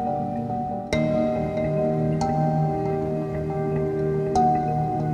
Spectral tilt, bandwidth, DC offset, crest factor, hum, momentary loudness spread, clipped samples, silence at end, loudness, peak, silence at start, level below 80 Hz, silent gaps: -8 dB/octave; 10 kHz; under 0.1%; 14 dB; none; 6 LU; under 0.1%; 0 s; -24 LUFS; -8 dBFS; 0 s; -44 dBFS; none